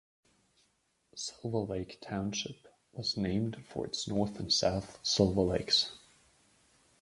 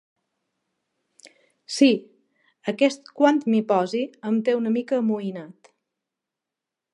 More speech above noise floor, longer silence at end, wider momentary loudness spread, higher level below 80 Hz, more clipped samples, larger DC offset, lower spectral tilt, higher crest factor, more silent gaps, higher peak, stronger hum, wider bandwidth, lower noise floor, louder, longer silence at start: second, 42 dB vs 65 dB; second, 1.05 s vs 1.45 s; about the same, 13 LU vs 13 LU; first, -56 dBFS vs -82 dBFS; neither; neither; about the same, -4.5 dB/octave vs -5.5 dB/octave; about the same, 24 dB vs 22 dB; neither; second, -12 dBFS vs -4 dBFS; neither; about the same, 11.5 kHz vs 11 kHz; second, -75 dBFS vs -87 dBFS; second, -33 LUFS vs -23 LUFS; second, 1.15 s vs 1.7 s